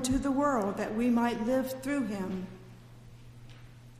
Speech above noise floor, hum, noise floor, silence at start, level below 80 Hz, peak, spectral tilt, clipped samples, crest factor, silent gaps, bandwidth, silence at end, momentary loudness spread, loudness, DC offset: 21 dB; none; -51 dBFS; 0 s; -52 dBFS; -16 dBFS; -5.5 dB/octave; under 0.1%; 16 dB; none; 15.5 kHz; 0 s; 24 LU; -30 LUFS; under 0.1%